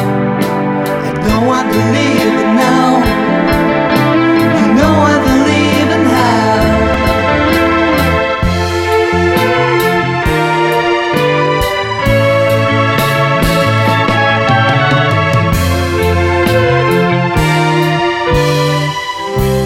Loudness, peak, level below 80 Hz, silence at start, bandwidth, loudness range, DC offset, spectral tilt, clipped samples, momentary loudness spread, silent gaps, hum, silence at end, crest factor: -11 LUFS; 0 dBFS; -28 dBFS; 0 s; 17 kHz; 2 LU; under 0.1%; -6 dB/octave; under 0.1%; 4 LU; none; none; 0 s; 10 dB